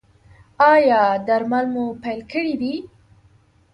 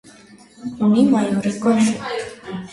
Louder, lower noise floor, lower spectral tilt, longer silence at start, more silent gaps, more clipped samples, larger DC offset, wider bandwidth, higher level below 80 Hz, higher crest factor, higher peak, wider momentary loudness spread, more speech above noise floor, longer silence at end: about the same, -19 LUFS vs -18 LUFS; first, -55 dBFS vs -46 dBFS; about the same, -6.5 dB/octave vs -6 dB/octave; about the same, 0.6 s vs 0.6 s; neither; neither; neither; second, 9.8 kHz vs 11.5 kHz; about the same, -58 dBFS vs -58 dBFS; about the same, 16 dB vs 16 dB; about the same, -4 dBFS vs -4 dBFS; second, 13 LU vs 17 LU; first, 37 dB vs 29 dB; first, 0.85 s vs 0 s